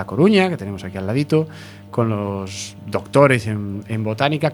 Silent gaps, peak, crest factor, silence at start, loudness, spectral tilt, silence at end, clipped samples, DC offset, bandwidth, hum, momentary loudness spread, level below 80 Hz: none; 0 dBFS; 18 dB; 0 s; -20 LUFS; -6.5 dB/octave; 0 s; under 0.1%; under 0.1%; 19 kHz; 50 Hz at -40 dBFS; 14 LU; -56 dBFS